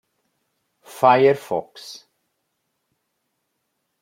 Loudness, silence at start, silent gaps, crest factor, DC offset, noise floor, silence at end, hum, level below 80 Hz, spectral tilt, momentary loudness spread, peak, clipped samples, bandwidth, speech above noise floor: -18 LUFS; 0.95 s; none; 22 dB; under 0.1%; -75 dBFS; 2.05 s; none; -72 dBFS; -5.5 dB/octave; 23 LU; -2 dBFS; under 0.1%; 16 kHz; 57 dB